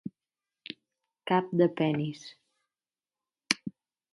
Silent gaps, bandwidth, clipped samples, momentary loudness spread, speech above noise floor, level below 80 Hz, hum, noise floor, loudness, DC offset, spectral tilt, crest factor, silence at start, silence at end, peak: none; 11.5 kHz; under 0.1%; 20 LU; over 62 dB; -76 dBFS; none; under -90 dBFS; -29 LUFS; under 0.1%; -5 dB/octave; 30 dB; 0.05 s; 0.45 s; -4 dBFS